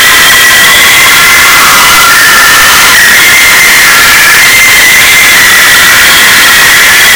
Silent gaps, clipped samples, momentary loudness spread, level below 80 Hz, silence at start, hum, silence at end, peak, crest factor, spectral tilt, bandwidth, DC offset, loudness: none; 40%; 0 LU; -30 dBFS; 0 s; none; 0 s; 0 dBFS; 2 dB; 0.5 dB/octave; over 20 kHz; under 0.1%; 1 LUFS